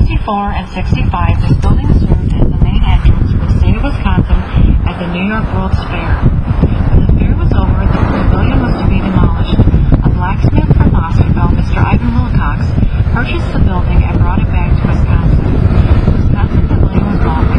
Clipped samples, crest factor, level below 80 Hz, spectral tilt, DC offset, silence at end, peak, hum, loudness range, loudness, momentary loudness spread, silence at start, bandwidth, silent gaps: 0.2%; 10 dB; -12 dBFS; -9 dB/octave; under 0.1%; 0 s; 0 dBFS; none; 2 LU; -12 LUFS; 4 LU; 0 s; 6 kHz; none